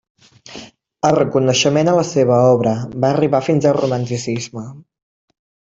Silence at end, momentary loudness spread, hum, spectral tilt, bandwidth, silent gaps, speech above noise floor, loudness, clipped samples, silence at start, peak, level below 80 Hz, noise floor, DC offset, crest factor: 0.95 s; 21 LU; none; -5.5 dB/octave; 8 kHz; none; 23 dB; -16 LUFS; under 0.1%; 0.5 s; -2 dBFS; -54 dBFS; -38 dBFS; under 0.1%; 14 dB